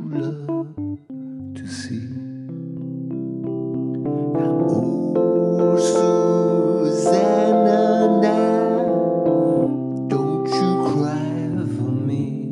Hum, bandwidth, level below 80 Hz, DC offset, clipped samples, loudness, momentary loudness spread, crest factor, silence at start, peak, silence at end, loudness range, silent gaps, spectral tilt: none; 11 kHz; -64 dBFS; under 0.1%; under 0.1%; -20 LUFS; 14 LU; 16 dB; 0 s; -4 dBFS; 0 s; 12 LU; none; -7.5 dB/octave